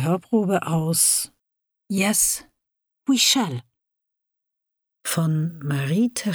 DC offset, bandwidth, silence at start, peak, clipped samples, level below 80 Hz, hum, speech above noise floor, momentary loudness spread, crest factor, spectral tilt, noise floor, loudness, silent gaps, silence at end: under 0.1%; over 20 kHz; 0 s; -6 dBFS; under 0.1%; -60 dBFS; none; 61 dB; 12 LU; 18 dB; -3.5 dB/octave; -82 dBFS; -21 LUFS; none; 0 s